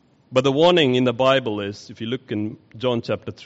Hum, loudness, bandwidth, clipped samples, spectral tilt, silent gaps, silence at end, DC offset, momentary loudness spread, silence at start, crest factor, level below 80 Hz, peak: none; -20 LUFS; 8 kHz; under 0.1%; -4 dB/octave; none; 0 s; under 0.1%; 13 LU; 0.3 s; 16 dB; -60 dBFS; -4 dBFS